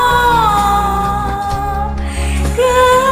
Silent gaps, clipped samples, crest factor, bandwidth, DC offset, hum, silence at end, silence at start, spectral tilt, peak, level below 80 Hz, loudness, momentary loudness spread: none; under 0.1%; 12 dB; 16 kHz; under 0.1%; none; 0 s; 0 s; -4.5 dB/octave; 0 dBFS; -22 dBFS; -14 LUFS; 9 LU